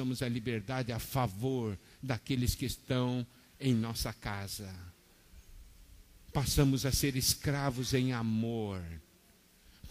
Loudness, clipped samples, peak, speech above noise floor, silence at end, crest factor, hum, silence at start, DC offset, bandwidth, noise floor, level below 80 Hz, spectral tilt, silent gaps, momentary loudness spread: -34 LUFS; under 0.1%; -14 dBFS; 30 dB; 0 s; 20 dB; none; 0 s; under 0.1%; 15.5 kHz; -64 dBFS; -50 dBFS; -5 dB/octave; none; 13 LU